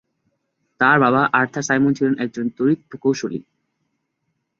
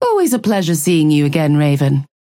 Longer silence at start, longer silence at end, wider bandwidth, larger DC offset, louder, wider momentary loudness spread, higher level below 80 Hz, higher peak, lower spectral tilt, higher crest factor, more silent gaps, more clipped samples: first, 0.8 s vs 0 s; first, 1.2 s vs 0.2 s; second, 7.6 kHz vs 17 kHz; neither; second, -19 LUFS vs -14 LUFS; first, 10 LU vs 3 LU; second, -62 dBFS vs -56 dBFS; about the same, -2 dBFS vs -4 dBFS; about the same, -5.5 dB/octave vs -6 dB/octave; first, 20 dB vs 10 dB; neither; neither